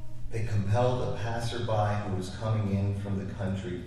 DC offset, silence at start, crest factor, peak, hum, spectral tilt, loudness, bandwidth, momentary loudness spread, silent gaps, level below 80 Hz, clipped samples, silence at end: under 0.1%; 0 s; 16 dB; -12 dBFS; none; -7 dB/octave; -31 LUFS; 11.5 kHz; 7 LU; none; -46 dBFS; under 0.1%; 0 s